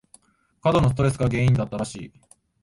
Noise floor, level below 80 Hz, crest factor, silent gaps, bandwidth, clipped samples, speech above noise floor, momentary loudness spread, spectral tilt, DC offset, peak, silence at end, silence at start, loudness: -57 dBFS; -42 dBFS; 16 dB; none; 11.5 kHz; under 0.1%; 35 dB; 14 LU; -7 dB/octave; under 0.1%; -6 dBFS; 0.55 s; 0.65 s; -22 LUFS